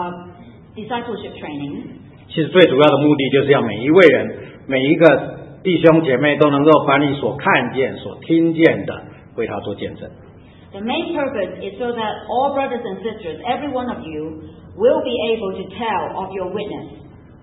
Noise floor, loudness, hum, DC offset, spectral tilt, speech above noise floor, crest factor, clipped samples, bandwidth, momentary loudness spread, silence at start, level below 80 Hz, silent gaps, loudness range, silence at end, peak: -40 dBFS; -17 LUFS; none; under 0.1%; -8 dB/octave; 23 dB; 18 dB; under 0.1%; 5.8 kHz; 19 LU; 0 s; -52 dBFS; none; 9 LU; 0.35 s; 0 dBFS